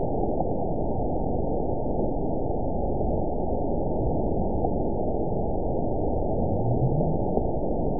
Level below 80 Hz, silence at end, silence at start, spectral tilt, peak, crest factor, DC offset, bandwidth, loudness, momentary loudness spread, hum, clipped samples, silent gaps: -34 dBFS; 0 s; 0 s; -18.5 dB/octave; -10 dBFS; 16 dB; 3%; 1 kHz; -27 LUFS; 3 LU; none; under 0.1%; none